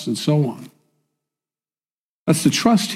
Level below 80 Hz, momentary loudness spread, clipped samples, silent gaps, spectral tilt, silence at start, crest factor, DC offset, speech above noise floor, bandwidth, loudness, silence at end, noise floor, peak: -60 dBFS; 11 LU; under 0.1%; 1.91-2.26 s; -5 dB/octave; 0 s; 18 dB; under 0.1%; over 72 dB; 16 kHz; -19 LUFS; 0 s; under -90 dBFS; -4 dBFS